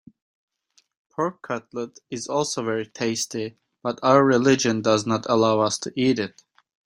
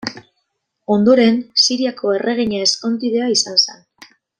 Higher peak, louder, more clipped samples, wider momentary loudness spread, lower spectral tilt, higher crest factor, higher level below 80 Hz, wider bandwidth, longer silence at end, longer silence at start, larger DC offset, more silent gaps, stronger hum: about the same, -2 dBFS vs -2 dBFS; second, -23 LUFS vs -15 LUFS; neither; first, 15 LU vs 7 LU; first, -4.5 dB/octave vs -3 dB/octave; first, 22 dB vs 16 dB; second, -64 dBFS vs -58 dBFS; first, 16 kHz vs 10 kHz; about the same, 0.65 s vs 0.65 s; first, 1.2 s vs 0.05 s; neither; neither; neither